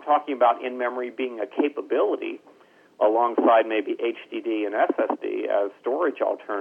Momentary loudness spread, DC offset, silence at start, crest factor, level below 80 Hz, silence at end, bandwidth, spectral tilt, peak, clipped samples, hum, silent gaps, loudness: 9 LU; under 0.1%; 0 s; 16 dB; -86 dBFS; 0 s; 4.8 kHz; -5.5 dB/octave; -8 dBFS; under 0.1%; none; none; -24 LUFS